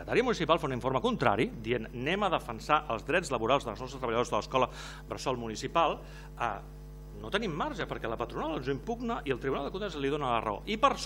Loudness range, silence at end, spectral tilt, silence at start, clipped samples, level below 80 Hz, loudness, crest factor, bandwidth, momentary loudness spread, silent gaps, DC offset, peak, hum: 5 LU; 0 s; -5 dB/octave; 0 s; under 0.1%; -48 dBFS; -32 LUFS; 24 dB; 16.5 kHz; 8 LU; none; under 0.1%; -8 dBFS; none